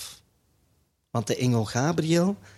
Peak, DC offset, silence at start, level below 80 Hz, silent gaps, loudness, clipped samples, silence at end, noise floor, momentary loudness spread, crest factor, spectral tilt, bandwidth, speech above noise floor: -10 dBFS; under 0.1%; 0 s; -60 dBFS; none; -25 LUFS; under 0.1%; 0.1 s; -69 dBFS; 9 LU; 18 dB; -5.5 dB/octave; 14.5 kHz; 44 dB